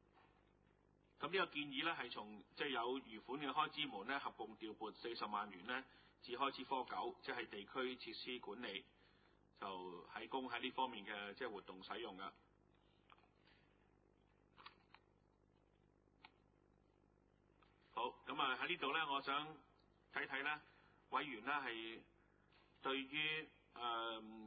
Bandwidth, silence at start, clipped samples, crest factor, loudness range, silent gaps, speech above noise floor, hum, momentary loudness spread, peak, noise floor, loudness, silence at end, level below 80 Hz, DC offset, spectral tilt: 4.8 kHz; 0.15 s; under 0.1%; 24 dB; 8 LU; none; 30 dB; 50 Hz at -80 dBFS; 12 LU; -24 dBFS; -76 dBFS; -46 LUFS; 0 s; -82 dBFS; under 0.1%; -0.5 dB/octave